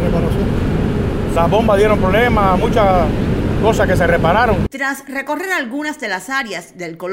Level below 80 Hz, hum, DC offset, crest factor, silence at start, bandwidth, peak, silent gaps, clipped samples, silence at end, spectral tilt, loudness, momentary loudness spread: -26 dBFS; none; under 0.1%; 12 dB; 0 s; 16 kHz; -2 dBFS; none; under 0.1%; 0 s; -6.5 dB/octave; -15 LUFS; 9 LU